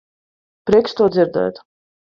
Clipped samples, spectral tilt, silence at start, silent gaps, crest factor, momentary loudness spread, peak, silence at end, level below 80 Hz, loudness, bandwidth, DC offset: under 0.1%; -7 dB/octave; 0.65 s; none; 18 dB; 9 LU; -2 dBFS; 0.6 s; -52 dBFS; -17 LUFS; 7.2 kHz; under 0.1%